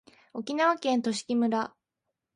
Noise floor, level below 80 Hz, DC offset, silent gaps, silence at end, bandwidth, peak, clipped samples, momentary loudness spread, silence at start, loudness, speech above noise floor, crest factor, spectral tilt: -85 dBFS; -76 dBFS; under 0.1%; none; 0.65 s; 11.5 kHz; -12 dBFS; under 0.1%; 13 LU; 0.35 s; -28 LUFS; 58 dB; 18 dB; -4 dB/octave